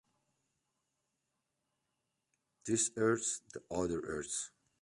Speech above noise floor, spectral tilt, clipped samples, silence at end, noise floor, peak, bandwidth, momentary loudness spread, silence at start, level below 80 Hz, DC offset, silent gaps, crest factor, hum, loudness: 49 dB; -3.5 dB/octave; under 0.1%; 0.35 s; -86 dBFS; -20 dBFS; 11.5 kHz; 11 LU; 2.65 s; -66 dBFS; under 0.1%; none; 20 dB; none; -36 LUFS